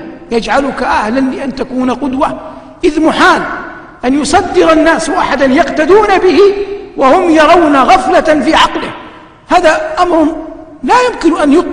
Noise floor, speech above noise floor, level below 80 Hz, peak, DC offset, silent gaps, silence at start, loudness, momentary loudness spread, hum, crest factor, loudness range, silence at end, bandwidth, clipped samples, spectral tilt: -33 dBFS; 24 dB; -34 dBFS; 0 dBFS; under 0.1%; none; 0 s; -9 LUFS; 13 LU; none; 10 dB; 5 LU; 0 s; 10.5 kHz; 0.8%; -4 dB/octave